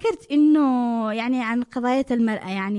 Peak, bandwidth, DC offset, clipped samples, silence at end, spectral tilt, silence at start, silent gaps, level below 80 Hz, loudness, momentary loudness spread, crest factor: -10 dBFS; 11 kHz; under 0.1%; under 0.1%; 0 s; -6.5 dB/octave; 0 s; none; -60 dBFS; -21 LUFS; 7 LU; 10 dB